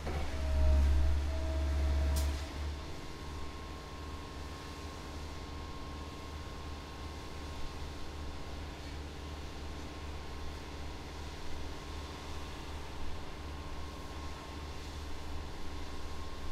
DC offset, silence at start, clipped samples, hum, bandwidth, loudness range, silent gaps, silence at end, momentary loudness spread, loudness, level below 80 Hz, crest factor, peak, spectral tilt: under 0.1%; 0 s; under 0.1%; none; 14 kHz; 10 LU; none; 0 s; 12 LU; -40 LUFS; -38 dBFS; 18 dB; -18 dBFS; -5.5 dB/octave